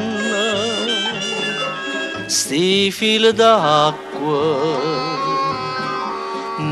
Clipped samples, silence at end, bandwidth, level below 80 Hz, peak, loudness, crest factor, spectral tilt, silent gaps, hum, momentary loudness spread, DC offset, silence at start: under 0.1%; 0 s; 14 kHz; -58 dBFS; 0 dBFS; -18 LUFS; 18 dB; -3 dB/octave; none; none; 10 LU; under 0.1%; 0 s